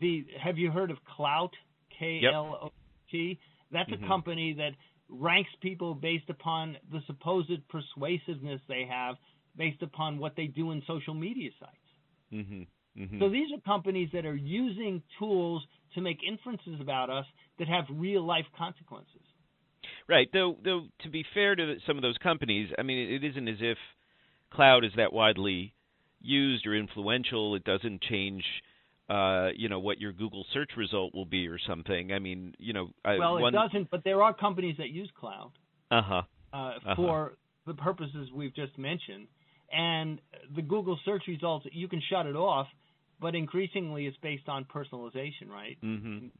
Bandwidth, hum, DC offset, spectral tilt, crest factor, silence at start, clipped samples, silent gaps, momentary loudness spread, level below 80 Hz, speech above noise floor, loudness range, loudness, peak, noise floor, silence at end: 4.3 kHz; none; under 0.1%; -9 dB/octave; 26 dB; 0 s; under 0.1%; none; 15 LU; -62 dBFS; 39 dB; 8 LU; -31 LUFS; -8 dBFS; -71 dBFS; 0.1 s